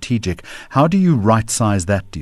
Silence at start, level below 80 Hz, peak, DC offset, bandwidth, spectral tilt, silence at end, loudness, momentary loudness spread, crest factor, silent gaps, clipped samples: 0 s; -40 dBFS; -2 dBFS; under 0.1%; 13.5 kHz; -6 dB/octave; 0 s; -16 LUFS; 8 LU; 14 dB; none; under 0.1%